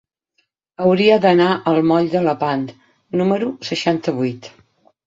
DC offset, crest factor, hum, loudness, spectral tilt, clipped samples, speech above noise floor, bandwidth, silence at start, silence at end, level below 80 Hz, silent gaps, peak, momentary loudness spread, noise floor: under 0.1%; 16 dB; none; -17 LUFS; -6.5 dB/octave; under 0.1%; 51 dB; 7.8 kHz; 0.8 s; 0.6 s; -60 dBFS; none; -2 dBFS; 11 LU; -68 dBFS